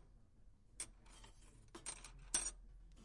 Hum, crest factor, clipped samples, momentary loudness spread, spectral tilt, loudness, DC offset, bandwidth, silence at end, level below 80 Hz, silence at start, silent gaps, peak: none; 30 dB; under 0.1%; 24 LU; -0.5 dB/octave; -45 LUFS; under 0.1%; 11.5 kHz; 0 s; -62 dBFS; 0 s; none; -22 dBFS